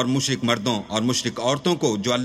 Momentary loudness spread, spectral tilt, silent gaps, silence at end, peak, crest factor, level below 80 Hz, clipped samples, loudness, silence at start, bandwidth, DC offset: 2 LU; -4 dB/octave; none; 0 s; -6 dBFS; 16 dB; -58 dBFS; under 0.1%; -22 LUFS; 0 s; 14 kHz; under 0.1%